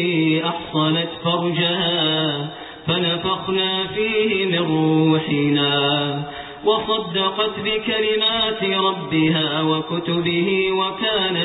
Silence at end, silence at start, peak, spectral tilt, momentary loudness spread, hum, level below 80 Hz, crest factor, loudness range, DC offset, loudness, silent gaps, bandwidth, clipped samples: 0 s; 0 s; -6 dBFS; -3 dB/octave; 5 LU; none; -54 dBFS; 14 dB; 1 LU; under 0.1%; -19 LUFS; none; 4.1 kHz; under 0.1%